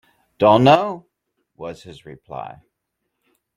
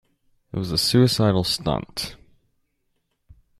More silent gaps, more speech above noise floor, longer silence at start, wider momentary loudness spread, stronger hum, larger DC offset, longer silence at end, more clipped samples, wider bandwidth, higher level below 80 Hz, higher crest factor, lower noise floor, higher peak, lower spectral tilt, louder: neither; first, 59 dB vs 51 dB; second, 0.4 s vs 0.55 s; first, 24 LU vs 14 LU; neither; neither; second, 1.05 s vs 1.45 s; neither; second, 11 kHz vs 14 kHz; second, -60 dBFS vs -48 dBFS; about the same, 20 dB vs 20 dB; first, -77 dBFS vs -72 dBFS; first, 0 dBFS vs -4 dBFS; first, -7 dB/octave vs -5 dB/octave; first, -15 LUFS vs -21 LUFS